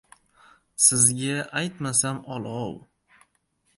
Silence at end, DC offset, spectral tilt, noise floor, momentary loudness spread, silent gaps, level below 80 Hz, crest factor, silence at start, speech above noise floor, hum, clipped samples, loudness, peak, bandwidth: 1 s; under 0.1%; -2.5 dB/octave; -70 dBFS; 17 LU; none; -62 dBFS; 24 dB; 0.8 s; 46 dB; none; under 0.1%; -22 LUFS; -4 dBFS; 12 kHz